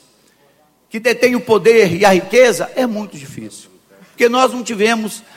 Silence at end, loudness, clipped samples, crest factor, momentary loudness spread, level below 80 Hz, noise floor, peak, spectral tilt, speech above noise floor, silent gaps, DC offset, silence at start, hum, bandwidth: 0.15 s; -13 LUFS; under 0.1%; 16 dB; 19 LU; -58 dBFS; -54 dBFS; 0 dBFS; -4 dB/octave; 40 dB; none; under 0.1%; 0.95 s; none; 16.5 kHz